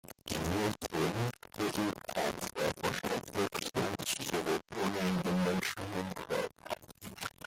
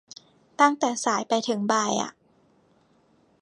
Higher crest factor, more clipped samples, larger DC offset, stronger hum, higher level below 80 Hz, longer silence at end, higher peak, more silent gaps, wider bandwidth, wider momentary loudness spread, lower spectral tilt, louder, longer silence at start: second, 14 dB vs 22 dB; neither; neither; neither; first, -62 dBFS vs -78 dBFS; second, 0.15 s vs 1.3 s; second, -20 dBFS vs -4 dBFS; neither; first, 16.5 kHz vs 11 kHz; about the same, 7 LU vs 9 LU; first, -4.5 dB/octave vs -3 dB/octave; second, -35 LUFS vs -24 LUFS; second, 0.05 s vs 0.6 s